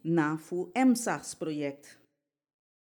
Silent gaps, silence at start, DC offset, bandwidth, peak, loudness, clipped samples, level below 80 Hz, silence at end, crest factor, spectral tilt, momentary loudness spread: none; 0.05 s; under 0.1%; 19.5 kHz; -14 dBFS; -30 LUFS; under 0.1%; -80 dBFS; 1 s; 18 dB; -5.5 dB/octave; 11 LU